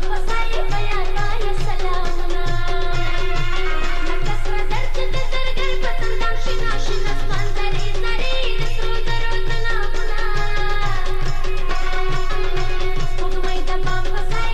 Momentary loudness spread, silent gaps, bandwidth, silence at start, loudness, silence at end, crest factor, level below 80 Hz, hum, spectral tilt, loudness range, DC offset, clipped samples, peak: 2 LU; none; 7.6 kHz; 0 s; -24 LUFS; 0 s; 6 dB; -16 dBFS; none; -4.5 dB/octave; 1 LU; under 0.1%; under 0.1%; -8 dBFS